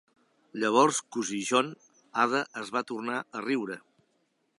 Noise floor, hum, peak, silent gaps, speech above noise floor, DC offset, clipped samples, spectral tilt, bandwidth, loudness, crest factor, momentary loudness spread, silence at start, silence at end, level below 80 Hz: -74 dBFS; none; -8 dBFS; none; 45 dB; under 0.1%; under 0.1%; -3 dB/octave; 11.5 kHz; -29 LUFS; 22 dB; 12 LU; 0.55 s; 0.8 s; -82 dBFS